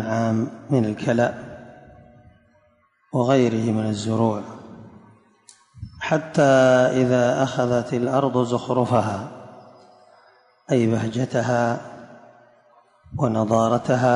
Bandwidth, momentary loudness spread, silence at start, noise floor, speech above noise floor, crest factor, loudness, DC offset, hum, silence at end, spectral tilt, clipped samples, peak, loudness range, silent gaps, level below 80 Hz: 11 kHz; 20 LU; 0 s; -62 dBFS; 42 dB; 16 dB; -21 LUFS; under 0.1%; none; 0 s; -6.5 dB/octave; under 0.1%; -6 dBFS; 6 LU; none; -56 dBFS